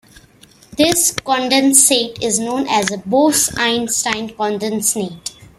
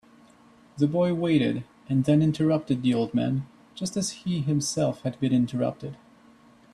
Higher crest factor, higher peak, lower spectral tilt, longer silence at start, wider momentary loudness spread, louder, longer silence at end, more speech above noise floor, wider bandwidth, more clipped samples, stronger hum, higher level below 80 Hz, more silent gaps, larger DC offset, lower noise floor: about the same, 16 dB vs 16 dB; first, 0 dBFS vs -10 dBFS; second, -2 dB/octave vs -6.5 dB/octave; about the same, 0.7 s vs 0.75 s; about the same, 11 LU vs 9 LU; first, -15 LUFS vs -26 LUFS; second, 0.15 s vs 0.8 s; about the same, 31 dB vs 31 dB; first, 16 kHz vs 12.5 kHz; neither; neither; first, -50 dBFS vs -62 dBFS; neither; neither; second, -47 dBFS vs -55 dBFS